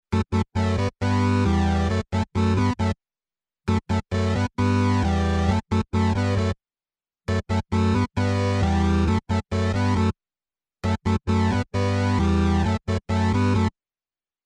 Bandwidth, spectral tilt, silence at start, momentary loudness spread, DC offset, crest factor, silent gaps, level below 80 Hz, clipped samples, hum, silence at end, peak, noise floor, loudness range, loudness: 9.6 kHz; -7 dB/octave; 0.1 s; 6 LU; under 0.1%; 14 dB; none; -34 dBFS; under 0.1%; none; 0.75 s; -10 dBFS; under -90 dBFS; 1 LU; -23 LUFS